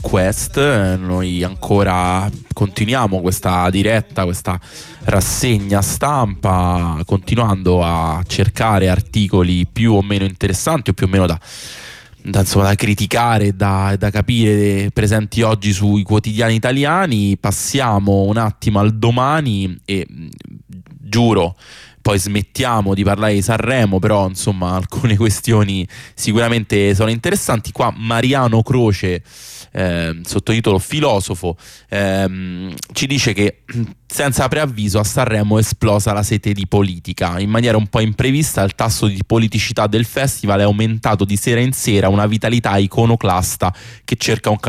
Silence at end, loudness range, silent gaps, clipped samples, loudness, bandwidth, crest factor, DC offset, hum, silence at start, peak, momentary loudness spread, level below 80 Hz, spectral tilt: 0 s; 3 LU; none; under 0.1%; -16 LUFS; 15.5 kHz; 12 dB; under 0.1%; none; 0 s; -4 dBFS; 8 LU; -36 dBFS; -5.5 dB/octave